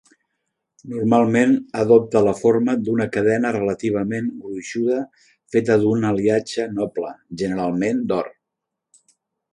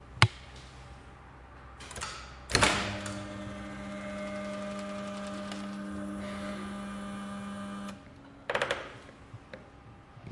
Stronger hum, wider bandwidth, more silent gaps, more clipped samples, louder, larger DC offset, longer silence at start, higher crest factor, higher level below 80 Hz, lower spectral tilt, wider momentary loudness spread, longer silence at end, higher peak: neither; about the same, 11 kHz vs 11.5 kHz; neither; neither; first, -20 LUFS vs -34 LUFS; neither; first, 0.85 s vs 0 s; second, 18 dB vs 34 dB; second, -58 dBFS vs -52 dBFS; first, -7 dB/octave vs -4 dB/octave; second, 12 LU vs 24 LU; first, 1.2 s vs 0 s; about the same, -2 dBFS vs -2 dBFS